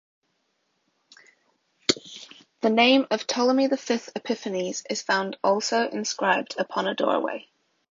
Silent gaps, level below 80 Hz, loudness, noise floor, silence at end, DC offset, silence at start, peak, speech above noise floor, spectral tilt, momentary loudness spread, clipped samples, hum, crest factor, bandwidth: none; -72 dBFS; -24 LUFS; -73 dBFS; 0.5 s; under 0.1%; 1.9 s; -4 dBFS; 49 dB; -3 dB/octave; 10 LU; under 0.1%; none; 22 dB; 7.6 kHz